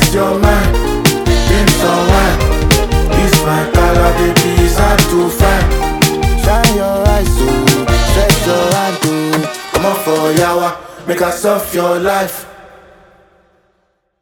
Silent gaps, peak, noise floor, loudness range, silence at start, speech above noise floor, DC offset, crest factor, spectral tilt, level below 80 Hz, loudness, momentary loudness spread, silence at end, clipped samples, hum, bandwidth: none; 0 dBFS; -61 dBFS; 4 LU; 0 s; 50 dB; under 0.1%; 12 dB; -4.5 dB/octave; -18 dBFS; -12 LUFS; 5 LU; 1.6 s; under 0.1%; none; over 20 kHz